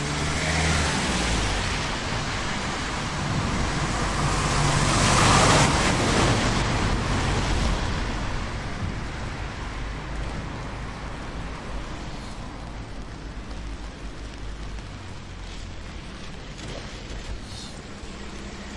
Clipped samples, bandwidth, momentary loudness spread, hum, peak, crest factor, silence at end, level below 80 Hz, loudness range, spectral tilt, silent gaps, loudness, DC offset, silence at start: under 0.1%; 11.5 kHz; 17 LU; none; -4 dBFS; 22 dB; 0 s; -34 dBFS; 17 LU; -4 dB/octave; none; -25 LUFS; under 0.1%; 0 s